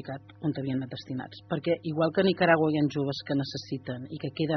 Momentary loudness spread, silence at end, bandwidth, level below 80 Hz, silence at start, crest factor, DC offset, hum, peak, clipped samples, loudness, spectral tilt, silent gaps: 14 LU; 0 s; 6.4 kHz; -66 dBFS; 0 s; 22 dB; under 0.1%; none; -8 dBFS; under 0.1%; -29 LUFS; -5 dB/octave; none